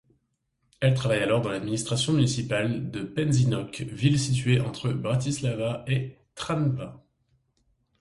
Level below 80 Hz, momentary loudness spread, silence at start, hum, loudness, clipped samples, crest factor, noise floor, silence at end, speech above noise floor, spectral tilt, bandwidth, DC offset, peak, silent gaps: -54 dBFS; 8 LU; 0.8 s; none; -26 LUFS; under 0.1%; 18 dB; -75 dBFS; 1.05 s; 49 dB; -5.5 dB/octave; 11.5 kHz; under 0.1%; -10 dBFS; none